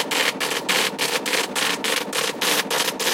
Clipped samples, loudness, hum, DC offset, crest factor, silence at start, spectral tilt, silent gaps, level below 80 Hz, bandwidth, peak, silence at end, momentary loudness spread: under 0.1%; -21 LUFS; none; under 0.1%; 18 dB; 0 s; -0.5 dB/octave; none; -68 dBFS; 17 kHz; -6 dBFS; 0 s; 3 LU